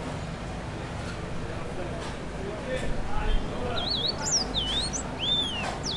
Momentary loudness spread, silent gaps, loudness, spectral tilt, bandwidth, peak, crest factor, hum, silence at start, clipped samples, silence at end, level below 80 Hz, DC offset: 11 LU; none; -29 LUFS; -3 dB/octave; 12 kHz; -14 dBFS; 16 dB; none; 0 s; under 0.1%; 0 s; -36 dBFS; under 0.1%